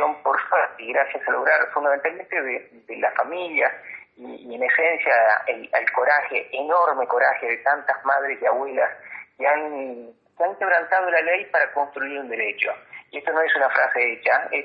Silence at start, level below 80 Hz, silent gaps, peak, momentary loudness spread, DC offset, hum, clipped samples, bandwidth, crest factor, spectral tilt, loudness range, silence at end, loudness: 0 s; -80 dBFS; none; -6 dBFS; 13 LU; under 0.1%; none; under 0.1%; 5.2 kHz; 18 dB; -6 dB/octave; 3 LU; 0 s; -21 LUFS